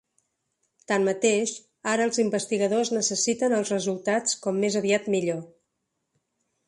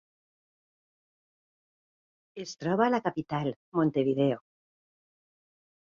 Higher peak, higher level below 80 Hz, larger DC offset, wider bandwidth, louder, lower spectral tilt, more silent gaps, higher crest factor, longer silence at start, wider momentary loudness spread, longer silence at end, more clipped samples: about the same, -8 dBFS vs -10 dBFS; about the same, -72 dBFS vs -70 dBFS; neither; first, 11.5 kHz vs 7.4 kHz; first, -25 LUFS vs -29 LUFS; second, -3.5 dB/octave vs -7 dB/octave; second, none vs 3.56-3.72 s; about the same, 18 dB vs 22 dB; second, 0.9 s vs 2.35 s; second, 5 LU vs 14 LU; second, 1.2 s vs 1.45 s; neither